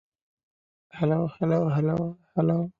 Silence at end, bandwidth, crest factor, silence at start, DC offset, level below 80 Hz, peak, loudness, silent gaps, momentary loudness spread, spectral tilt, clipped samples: 0.1 s; 5 kHz; 18 dB; 0.95 s; under 0.1%; -62 dBFS; -10 dBFS; -26 LUFS; none; 6 LU; -10.5 dB/octave; under 0.1%